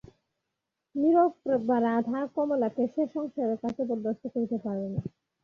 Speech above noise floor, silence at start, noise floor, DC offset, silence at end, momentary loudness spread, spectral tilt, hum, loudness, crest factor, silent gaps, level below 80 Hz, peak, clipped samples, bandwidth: 57 dB; 0.95 s; -85 dBFS; under 0.1%; 0.35 s; 9 LU; -9.5 dB/octave; none; -29 LUFS; 16 dB; none; -66 dBFS; -12 dBFS; under 0.1%; 6.6 kHz